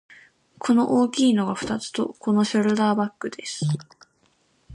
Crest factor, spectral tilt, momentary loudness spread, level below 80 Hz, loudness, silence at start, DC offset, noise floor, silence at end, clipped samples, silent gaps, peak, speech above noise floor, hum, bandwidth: 14 dB; -5.5 dB/octave; 11 LU; -62 dBFS; -23 LUFS; 0.6 s; under 0.1%; -65 dBFS; 0 s; under 0.1%; none; -8 dBFS; 43 dB; none; 11.5 kHz